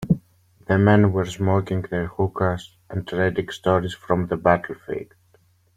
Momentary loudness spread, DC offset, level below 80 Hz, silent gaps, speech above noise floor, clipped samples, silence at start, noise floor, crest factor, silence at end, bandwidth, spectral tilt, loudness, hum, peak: 15 LU; under 0.1%; -50 dBFS; none; 38 dB; under 0.1%; 0 s; -59 dBFS; 18 dB; 0.75 s; 10.5 kHz; -7.5 dB/octave; -22 LUFS; none; -4 dBFS